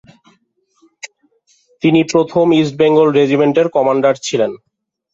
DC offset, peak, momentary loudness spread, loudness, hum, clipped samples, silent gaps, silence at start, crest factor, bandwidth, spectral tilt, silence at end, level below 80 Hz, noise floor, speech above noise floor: under 0.1%; -2 dBFS; 18 LU; -13 LUFS; none; under 0.1%; none; 1.05 s; 14 dB; 8 kHz; -6 dB/octave; 0.55 s; -58 dBFS; -60 dBFS; 48 dB